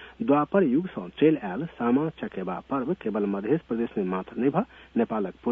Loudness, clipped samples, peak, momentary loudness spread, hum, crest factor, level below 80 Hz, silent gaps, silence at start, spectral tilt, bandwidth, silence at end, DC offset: -27 LUFS; under 0.1%; -8 dBFS; 8 LU; none; 18 dB; -60 dBFS; none; 0 s; -10 dB/octave; 3.9 kHz; 0 s; under 0.1%